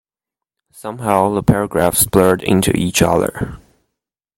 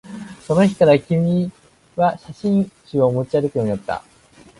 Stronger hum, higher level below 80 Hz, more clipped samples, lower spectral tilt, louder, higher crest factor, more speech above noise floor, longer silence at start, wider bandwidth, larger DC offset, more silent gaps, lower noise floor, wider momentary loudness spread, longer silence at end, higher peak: neither; first, -38 dBFS vs -52 dBFS; neither; second, -5 dB/octave vs -8 dB/octave; first, -15 LUFS vs -19 LUFS; about the same, 16 dB vs 18 dB; first, 71 dB vs 31 dB; first, 0.75 s vs 0.05 s; first, 16.5 kHz vs 11.5 kHz; neither; neither; first, -86 dBFS vs -49 dBFS; about the same, 14 LU vs 14 LU; first, 0.8 s vs 0.6 s; about the same, 0 dBFS vs -2 dBFS